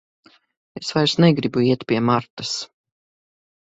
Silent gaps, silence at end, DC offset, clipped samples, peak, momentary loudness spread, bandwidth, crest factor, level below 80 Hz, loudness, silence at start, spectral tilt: 2.30-2.37 s; 1.1 s; under 0.1%; under 0.1%; -2 dBFS; 14 LU; 8 kHz; 20 dB; -58 dBFS; -20 LUFS; 0.75 s; -5.5 dB/octave